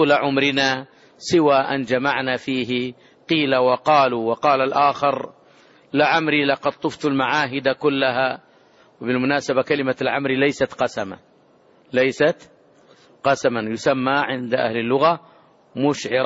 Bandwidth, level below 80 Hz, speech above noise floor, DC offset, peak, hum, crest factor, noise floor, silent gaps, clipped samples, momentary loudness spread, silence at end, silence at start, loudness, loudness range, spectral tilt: 8 kHz; -62 dBFS; 35 dB; under 0.1%; -6 dBFS; none; 16 dB; -55 dBFS; none; under 0.1%; 8 LU; 0 s; 0 s; -20 LUFS; 3 LU; -5 dB/octave